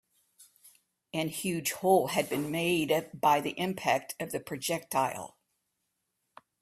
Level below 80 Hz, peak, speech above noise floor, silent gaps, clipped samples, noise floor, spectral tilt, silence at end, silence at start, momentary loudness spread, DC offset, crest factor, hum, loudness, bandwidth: -70 dBFS; -12 dBFS; 52 dB; none; under 0.1%; -81 dBFS; -4 dB/octave; 1.35 s; 0.4 s; 10 LU; under 0.1%; 20 dB; none; -30 LUFS; 16 kHz